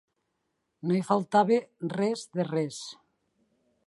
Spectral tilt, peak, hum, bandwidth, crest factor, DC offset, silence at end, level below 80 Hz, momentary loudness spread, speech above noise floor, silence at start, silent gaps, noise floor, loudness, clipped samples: -6 dB/octave; -10 dBFS; none; 11.5 kHz; 20 dB; under 0.1%; 0.95 s; -78 dBFS; 13 LU; 52 dB; 0.85 s; none; -79 dBFS; -28 LUFS; under 0.1%